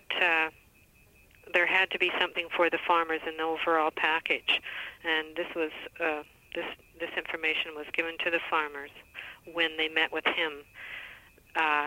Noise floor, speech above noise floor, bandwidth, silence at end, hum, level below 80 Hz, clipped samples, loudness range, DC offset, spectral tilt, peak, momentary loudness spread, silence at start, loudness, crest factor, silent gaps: -60 dBFS; 30 dB; 16 kHz; 0 s; none; -66 dBFS; under 0.1%; 5 LU; under 0.1%; -3 dB/octave; -10 dBFS; 15 LU; 0.1 s; -29 LUFS; 20 dB; none